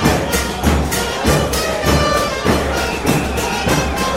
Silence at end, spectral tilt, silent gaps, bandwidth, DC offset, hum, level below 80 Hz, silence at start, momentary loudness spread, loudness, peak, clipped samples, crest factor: 0 s; -4.5 dB/octave; none; 16.5 kHz; under 0.1%; none; -24 dBFS; 0 s; 3 LU; -16 LUFS; 0 dBFS; under 0.1%; 16 dB